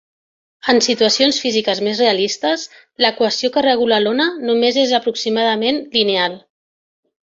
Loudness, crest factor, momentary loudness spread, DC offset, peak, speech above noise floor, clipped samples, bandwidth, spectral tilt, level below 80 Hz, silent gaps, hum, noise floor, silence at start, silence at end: -16 LUFS; 16 dB; 5 LU; under 0.1%; 0 dBFS; over 74 dB; under 0.1%; 7.6 kHz; -2.5 dB/octave; -62 dBFS; none; none; under -90 dBFS; 0.65 s; 0.85 s